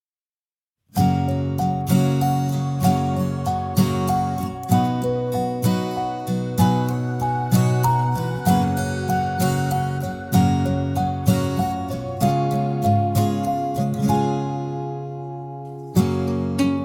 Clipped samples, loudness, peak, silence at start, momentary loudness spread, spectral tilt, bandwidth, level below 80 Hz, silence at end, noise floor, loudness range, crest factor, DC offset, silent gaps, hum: under 0.1%; -22 LUFS; -4 dBFS; 0.95 s; 8 LU; -7 dB/octave; 17.5 kHz; -48 dBFS; 0 s; under -90 dBFS; 2 LU; 18 dB; under 0.1%; none; none